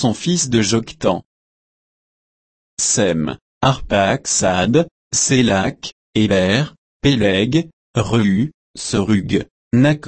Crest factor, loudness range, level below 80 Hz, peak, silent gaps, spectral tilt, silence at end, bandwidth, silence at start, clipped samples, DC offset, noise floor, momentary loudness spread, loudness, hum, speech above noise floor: 16 dB; 4 LU; -42 dBFS; -2 dBFS; 1.25-2.77 s, 3.41-3.61 s, 4.91-5.11 s, 5.92-6.13 s, 6.78-7.00 s, 7.73-7.94 s, 8.54-8.74 s, 9.51-9.71 s; -4.5 dB/octave; 0 s; 8.8 kHz; 0 s; under 0.1%; under 0.1%; under -90 dBFS; 9 LU; -17 LUFS; none; over 74 dB